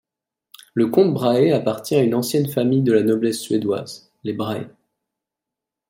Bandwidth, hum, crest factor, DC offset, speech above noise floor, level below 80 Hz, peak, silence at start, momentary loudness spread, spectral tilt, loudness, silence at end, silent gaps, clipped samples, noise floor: 16.5 kHz; none; 18 dB; under 0.1%; 67 dB; -64 dBFS; -4 dBFS; 0.75 s; 12 LU; -6.5 dB/octave; -19 LUFS; 1.2 s; none; under 0.1%; -85 dBFS